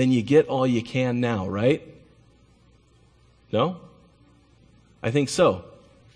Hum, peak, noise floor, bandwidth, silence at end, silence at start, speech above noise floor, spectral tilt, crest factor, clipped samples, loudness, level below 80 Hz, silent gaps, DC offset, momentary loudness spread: none; -6 dBFS; -57 dBFS; 10.5 kHz; 0.5 s; 0 s; 36 dB; -6.5 dB/octave; 20 dB; under 0.1%; -23 LUFS; -58 dBFS; none; under 0.1%; 10 LU